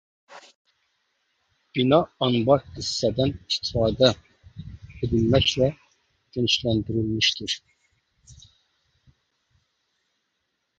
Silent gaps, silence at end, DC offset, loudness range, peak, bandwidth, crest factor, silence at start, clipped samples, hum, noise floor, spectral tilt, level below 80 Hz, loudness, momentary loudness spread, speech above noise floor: 0.55-0.65 s; 2.45 s; under 0.1%; 6 LU; -2 dBFS; 9.2 kHz; 24 dB; 0.3 s; under 0.1%; none; -76 dBFS; -5 dB/octave; -46 dBFS; -23 LUFS; 14 LU; 54 dB